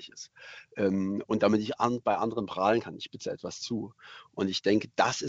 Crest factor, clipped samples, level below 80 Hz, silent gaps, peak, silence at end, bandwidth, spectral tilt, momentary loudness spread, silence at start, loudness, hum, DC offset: 20 dB; under 0.1%; -66 dBFS; none; -10 dBFS; 0 s; 8 kHz; -5 dB/octave; 18 LU; 0 s; -29 LUFS; none; under 0.1%